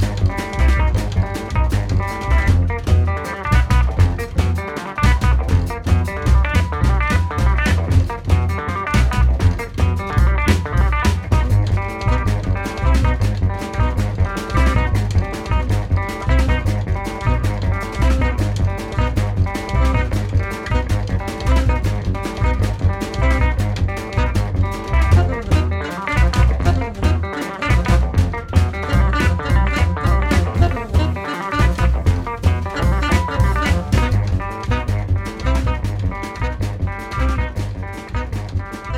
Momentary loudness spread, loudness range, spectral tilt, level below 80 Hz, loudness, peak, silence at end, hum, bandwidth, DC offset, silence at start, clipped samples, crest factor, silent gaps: 6 LU; 2 LU; -6.5 dB/octave; -20 dBFS; -19 LUFS; 0 dBFS; 0 s; none; 13.5 kHz; under 0.1%; 0 s; under 0.1%; 16 dB; none